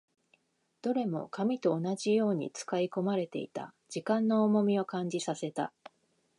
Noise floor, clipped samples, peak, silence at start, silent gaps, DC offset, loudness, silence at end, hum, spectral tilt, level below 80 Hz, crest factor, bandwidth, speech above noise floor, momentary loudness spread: -73 dBFS; under 0.1%; -16 dBFS; 0.85 s; none; under 0.1%; -32 LUFS; 0.7 s; none; -6 dB/octave; -82 dBFS; 16 dB; 11 kHz; 43 dB; 12 LU